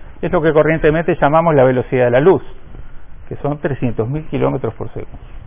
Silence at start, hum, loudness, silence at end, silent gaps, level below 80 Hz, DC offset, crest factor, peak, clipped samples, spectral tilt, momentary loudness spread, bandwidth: 0 s; none; -15 LUFS; 0.05 s; none; -36 dBFS; under 0.1%; 14 dB; -2 dBFS; under 0.1%; -11.5 dB/octave; 15 LU; 3.7 kHz